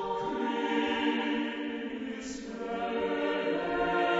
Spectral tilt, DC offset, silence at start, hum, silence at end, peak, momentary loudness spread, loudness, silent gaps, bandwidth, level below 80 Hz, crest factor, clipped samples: -4.5 dB/octave; under 0.1%; 0 s; none; 0 s; -16 dBFS; 9 LU; -32 LUFS; none; 8 kHz; -60 dBFS; 16 dB; under 0.1%